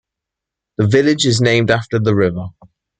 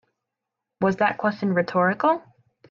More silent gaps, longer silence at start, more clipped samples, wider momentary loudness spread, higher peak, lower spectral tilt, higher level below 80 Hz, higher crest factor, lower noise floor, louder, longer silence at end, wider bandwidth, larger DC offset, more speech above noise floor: neither; about the same, 0.8 s vs 0.8 s; neither; first, 15 LU vs 5 LU; first, -2 dBFS vs -8 dBFS; second, -5.5 dB/octave vs -8 dB/octave; first, -50 dBFS vs -66 dBFS; about the same, 16 dB vs 18 dB; about the same, -83 dBFS vs -84 dBFS; first, -15 LUFS vs -23 LUFS; about the same, 0.5 s vs 0.5 s; first, 9.4 kHz vs 7 kHz; neither; first, 69 dB vs 62 dB